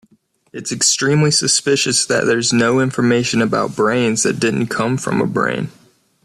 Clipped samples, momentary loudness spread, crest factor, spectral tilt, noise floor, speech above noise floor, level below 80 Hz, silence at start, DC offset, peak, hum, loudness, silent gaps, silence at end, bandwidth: under 0.1%; 6 LU; 16 dB; -3.5 dB/octave; -57 dBFS; 41 dB; -54 dBFS; 0.55 s; under 0.1%; -2 dBFS; none; -16 LUFS; none; 0.55 s; 13.5 kHz